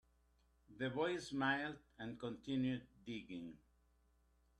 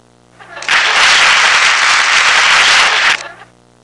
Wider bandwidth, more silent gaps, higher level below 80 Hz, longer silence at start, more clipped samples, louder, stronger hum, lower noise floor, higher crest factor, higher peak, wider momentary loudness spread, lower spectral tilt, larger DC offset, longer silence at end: about the same, 10.5 kHz vs 11.5 kHz; neither; second, -72 dBFS vs -50 dBFS; first, 0.7 s vs 0.4 s; neither; second, -43 LUFS vs -7 LUFS; second, none vs 60 Hz at -55 dBFS; first, -76 dBFS vs -41 dBFS; first, 20 dB vs 10 dB; second, -24 dBFS vs 0 dBFS; first, 13 LU vs 6 LU; first, -5.5 dB/octave vs 2 dB/octave; neither; first, 1.05 s vs 0.5 s